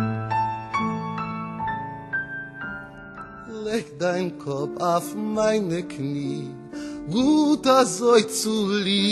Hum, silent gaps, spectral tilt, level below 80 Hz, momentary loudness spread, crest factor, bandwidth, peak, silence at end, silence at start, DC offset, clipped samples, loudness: none; none; -4.5 dB/octave; -56 dBFS; 16 LU; 20 dB; 12.5 kHz; -4 dBFS; 0 s; 0 s; under 0.1%; under 0.1%; -24 LUFS